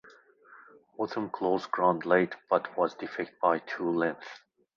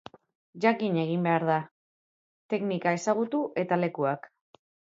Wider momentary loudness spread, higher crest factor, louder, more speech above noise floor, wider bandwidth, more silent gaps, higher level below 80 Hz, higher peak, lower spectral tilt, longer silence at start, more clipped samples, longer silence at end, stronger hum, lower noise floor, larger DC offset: first, 10 LU vs 6 LU; about the same, 22 dB vs 20 dB; about the same, -29 LUFS vs -28 LUFS; second, 28 dB vs over 63 dB; about the same, 7.2 kHz vs 7.8 kHz; second, none vs 1.71-2.49 s; first, -72 dBFS vs -78 dBFS; about the same, -10 dBFS vs -10 dBFS; about the same, -7 dB/octave vs -6.5 dB/octave; about the same, 0.5 s vs 0.55 s; neither; second, 0.4 s vs 0.7 s; neither; second, -57 dBFS vs under -90 dBFS; neither